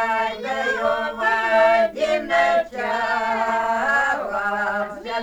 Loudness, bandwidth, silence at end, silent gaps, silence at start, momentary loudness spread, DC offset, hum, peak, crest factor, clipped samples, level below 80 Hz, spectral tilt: -20 LUFS; 13.5 kHz; 0 s; none; 0 s; 7 LU; under 0.1%; none; -6 dBFS; 16 dB; under 0.1%; -54 dBFS; -3.5 dB/octave